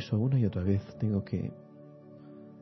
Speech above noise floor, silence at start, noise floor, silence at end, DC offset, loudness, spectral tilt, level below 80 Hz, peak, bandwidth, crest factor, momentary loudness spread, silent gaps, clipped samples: 21 dB; 0 s; -51 dBFS; 0 s; under 0.1%; -31 LUFS; -9.5 dB/octave; -60 dBFS; -16 dBFS; 6.2 kHz; 16 dB; 23 LU; none; under 0.1%